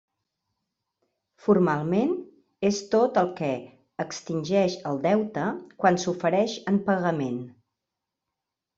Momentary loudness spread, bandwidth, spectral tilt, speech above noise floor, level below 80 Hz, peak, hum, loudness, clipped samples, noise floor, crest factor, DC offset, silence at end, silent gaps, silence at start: 11 LU; 7.8 kHz; -6 dB/octave; 61 dB; -68 dBFS; -6 dBFS; none; -26 LUFS; under 0.1%; -86 dBFS; 20 dB; under 0.1%; 1.3 s; none; 1.45 s